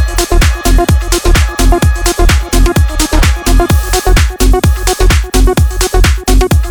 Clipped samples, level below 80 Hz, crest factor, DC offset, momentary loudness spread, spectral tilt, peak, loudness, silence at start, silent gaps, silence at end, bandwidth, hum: under 0.1%; -10 dBFS; 8 dB; 0.5%; 1 LU; -4.5 dB/octave; 0 dBFS; -10 LUFS; 0 s; none; 0 s; over 20 kHz; none